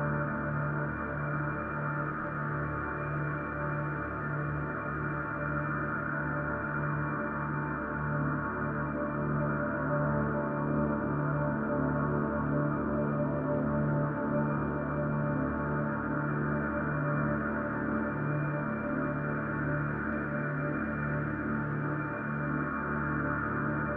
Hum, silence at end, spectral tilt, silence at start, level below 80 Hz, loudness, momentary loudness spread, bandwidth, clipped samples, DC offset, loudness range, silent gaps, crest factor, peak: none; 0 s; -12 dB/octave; 0 s; -48 dBFS; -32 LUFS; 3 LU; 3.3 kHz; under 0.1%; under 0.1%; 3 LU; none; 14 dB; -18 dBFS